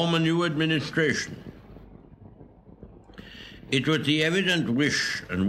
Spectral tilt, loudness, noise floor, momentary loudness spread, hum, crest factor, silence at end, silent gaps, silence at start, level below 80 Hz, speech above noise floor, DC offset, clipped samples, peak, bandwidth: -4.5 dB/octave; -24 LUFS; -50 dBFS; 21 LU; none; 18 dB; 0 s; none; 0 s; -56 dBFS; 25 dB; under 0.1%; under 0.1%; -8 dBFS; 13.5 kHz